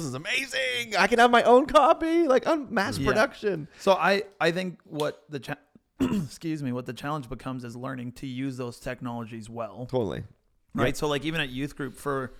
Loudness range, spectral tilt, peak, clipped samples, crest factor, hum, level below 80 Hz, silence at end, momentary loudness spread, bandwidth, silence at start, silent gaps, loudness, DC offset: 12 LU; -5 dB/octave; -6 dBFS; under 0.1%; 20 dB; none; -50 dBFS; 0 s; 17 LU; 16 kHz; 0 s; none; -26 LUFS; under 0.1%